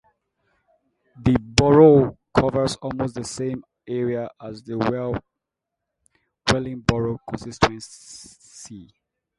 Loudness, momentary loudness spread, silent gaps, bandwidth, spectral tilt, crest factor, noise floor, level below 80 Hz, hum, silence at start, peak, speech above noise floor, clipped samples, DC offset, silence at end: -21 LUFS; 24 LU; none; 11.5 kHz; -6 dB/octave; 22 dB; -83 dBFS; -44 dBFS; none; 1.2 s; 0 dBFS; 62 dB; under 0.1%; under 0.1%; 0.55 s